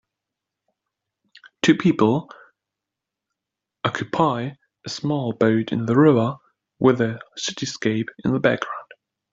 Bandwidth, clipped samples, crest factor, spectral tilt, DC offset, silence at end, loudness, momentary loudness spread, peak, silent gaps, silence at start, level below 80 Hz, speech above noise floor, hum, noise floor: 7.8 kHz; under 0.1%; 20 dB; -6 dB/octave; under 0.1%; 0.5 s; -21 LUFS; 12 LU; -2 dBFS; none; 1.65 s; -62 dBFS; 65 dB; none; -85 dBFS